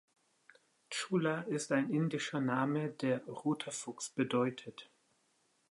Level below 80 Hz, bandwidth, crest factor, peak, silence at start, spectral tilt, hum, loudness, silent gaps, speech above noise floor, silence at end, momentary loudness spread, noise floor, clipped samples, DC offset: -84 dBFS; 11.5 kHz; 18 dB; -20 dBFS; 0.9 s; -5 dB/octave; none; -36 LUFS; none; 40 dB; 0.9 s; 8 LU; -76 dBFS; under 0.1%; under 0.1%